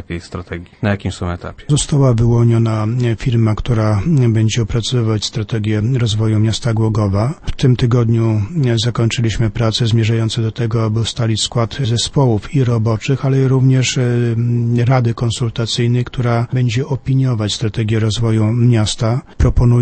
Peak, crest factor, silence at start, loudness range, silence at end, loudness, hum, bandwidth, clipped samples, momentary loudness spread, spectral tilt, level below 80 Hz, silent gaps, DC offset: 0 dBFS; 14 dB; 0 s; 2 LU; 0 s; -15 LUFS; none; 8.8 kHz; under 0.1%; 6 LU; -6 dB/octave; -30 dBFS; none; under 0.1%